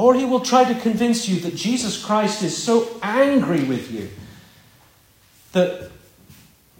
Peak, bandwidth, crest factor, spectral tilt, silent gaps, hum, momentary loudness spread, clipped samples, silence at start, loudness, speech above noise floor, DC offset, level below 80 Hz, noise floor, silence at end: -2 dBFS; 16.5 kHz; 20 dB; -4.5 dB/octave; none; none; 15 LU; under 0.1%; 0 s; -20 LUFS; 35 dB; under 0.1%; -58 dBFS; -54 dBFS; 0.85 s